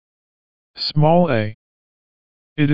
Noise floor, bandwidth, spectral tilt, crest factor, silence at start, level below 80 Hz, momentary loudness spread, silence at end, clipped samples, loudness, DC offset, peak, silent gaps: under -90 dBFS; 7.2 kHz; -5.5 dB/octave; 18 dB; 0.75 s; -50 dBFS; 14 LU; 0 s; under 0.1%; -18 LUFS; under 0.1%; -2 dBFS; 1.54-2.56 s